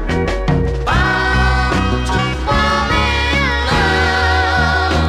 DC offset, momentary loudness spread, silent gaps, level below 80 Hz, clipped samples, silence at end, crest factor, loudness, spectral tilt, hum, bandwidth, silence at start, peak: under 0.1%; 3 LU; none; -20 dBFS; under 0.1%; 0 s; 12 dB; -15 LUFS; -5 dB/octave; none; 12 kHz; 0 s; -4 dBFS